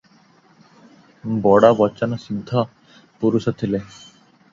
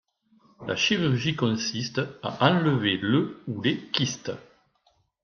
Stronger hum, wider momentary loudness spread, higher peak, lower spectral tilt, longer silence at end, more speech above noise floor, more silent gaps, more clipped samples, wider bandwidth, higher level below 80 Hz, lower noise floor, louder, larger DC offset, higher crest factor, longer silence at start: neither; first, 15 LU vs 10 LU; first, 0 dBFS vs -4 dBFS; first, -8 dB/octave vs -5 dB/octave; second, 0.65 s vs 0.85 s; second, 36 dB vs 42 dB; neither; neither; about the same, 7.6 kHz vs 7 kHz; first, -56 dBFS vs -64 dBFS; second, -54 dBFS vs -68 dBFS; first, -19 LUFS vs -25 LUFS; neither; about the same, 20 dB vs 22 dB; first, 1.25 s vs 0.6 s